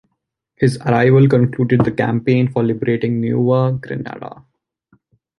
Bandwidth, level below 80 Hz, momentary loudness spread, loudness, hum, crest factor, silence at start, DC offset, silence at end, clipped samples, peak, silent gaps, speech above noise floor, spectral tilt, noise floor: 11.5 kHz; -50 dBFS; 15 LU; -16 LUFS; none; 16 dB; 0.6 s; under 0.1%; 1.1 s; under 0.1%; -2 dBFS; none; 59 dB; -9 dB/octave; -74 dBFS